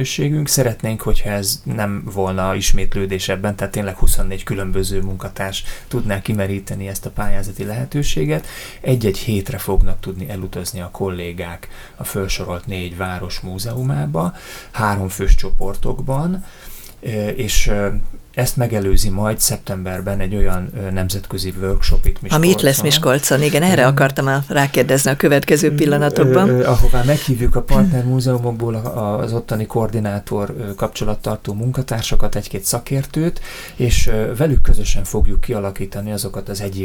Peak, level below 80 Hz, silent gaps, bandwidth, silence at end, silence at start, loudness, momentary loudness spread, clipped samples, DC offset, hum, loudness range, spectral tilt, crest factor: 0 dBFS; -22 dBFS; none; 18.5 kHz; 0 s; 0 s; -19 LUFS; 12 LU; under 0.1%; under 0.1%; none; 9 LU; -5 dB/octave; 16 dB